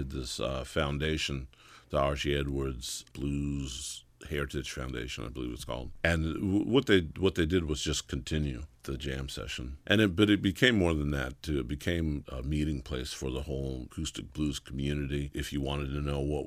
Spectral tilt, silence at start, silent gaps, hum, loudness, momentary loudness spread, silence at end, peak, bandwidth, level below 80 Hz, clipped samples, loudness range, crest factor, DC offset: -5 dB/octave; 0 s; none; none; -32 LUFS; 12 LU; 0 s; -8 dBFS; 15.5 kHz; -42 dBFS; under 0.1%; 6 LU; 24 dB; under 0.1%